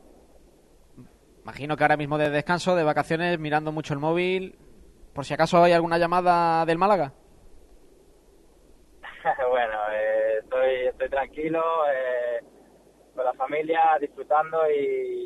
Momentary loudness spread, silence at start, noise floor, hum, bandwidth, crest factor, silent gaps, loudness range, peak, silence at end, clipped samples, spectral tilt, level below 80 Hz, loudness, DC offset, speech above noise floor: 11 LU; 0.95 s; -56 dBFS; none; 12.5 kHz; 20 dB; none; 5 LU; -6 dBFS; 0 s; under 0.1%; -6 dB/octave; -56 dBFS; -24 LUFS; under 0.1%; 32 dB